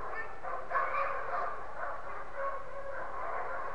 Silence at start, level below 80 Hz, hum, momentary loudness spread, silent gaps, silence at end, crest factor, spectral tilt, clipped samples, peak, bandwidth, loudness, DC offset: 0 s; -58 dBFS; none; 9 LU; none; 0 s; 20 dB; -5 dB/octave; under 0.1%; -18 dBFS; 10.5 kHz; -37 LUFS; 1%